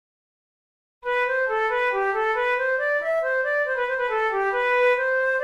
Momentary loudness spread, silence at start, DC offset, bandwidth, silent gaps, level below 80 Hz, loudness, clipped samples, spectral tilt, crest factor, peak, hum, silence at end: 4 LU; 1.05 s; under 0.1%; 8.8 kHz; none; -60 dBFS; -22 LUFS; under 0.1%; -3 dB/octave; 14 dB; -10 dBFS; none; 0 s